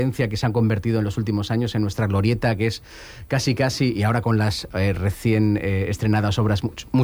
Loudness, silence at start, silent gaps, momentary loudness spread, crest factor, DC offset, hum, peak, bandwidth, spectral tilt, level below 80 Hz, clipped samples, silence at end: -22 LUFS; 0 s; none; 4 LU; 12 dB; under 0.1%; none; -8 dBFS; 19.5 kHz; -6.5 dB/octave; -42 dBFS; under 0.1%; 0 s